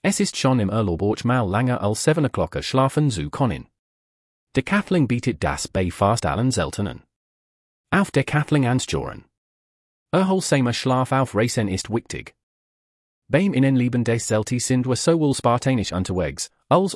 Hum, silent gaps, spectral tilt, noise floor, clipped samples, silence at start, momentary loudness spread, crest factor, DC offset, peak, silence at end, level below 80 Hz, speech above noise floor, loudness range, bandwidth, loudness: none; 3.79-4.47 s, 7.16-7.84 s, 9.38-10.06 s, 12.43-13.22 s; -5.5 dB/octave; under -90 dBFS; under 0.1%; 0.05 s; 7 LU; 16 dB; under 0.1%; -4 dBFS; 0 s; -48 dBFS; over 69 dB; 3 LU; 12 kHz; -21 LUFS